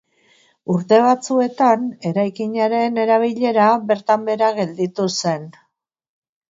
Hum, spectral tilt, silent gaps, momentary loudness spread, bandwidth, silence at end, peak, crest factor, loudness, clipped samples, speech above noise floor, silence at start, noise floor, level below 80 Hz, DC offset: none; -5.5 dB/octave; none; 8 LU; 7.8 kHz; 1 s; -2 dBFS; 16 dB; -18 LUFS; under 0.1%; 39 dB; 0.7 s; -57 dBFS; -70 dBFS; under 0.1%